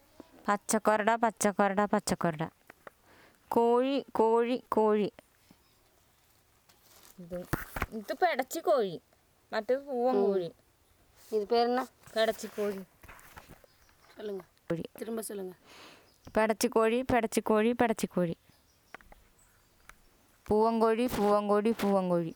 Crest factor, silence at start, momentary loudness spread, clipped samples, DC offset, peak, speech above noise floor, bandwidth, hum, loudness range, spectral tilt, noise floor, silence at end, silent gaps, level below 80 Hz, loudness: 20 dB; 0.45 s; 14 LU; under 0.1%; under 0.1%; -12 dBFS; 37 dB; over 20 kHz; none; 7 LU; -5 dB/octave; -66 dBFS; 0 s; none; -60 dBFS; -30 LUFS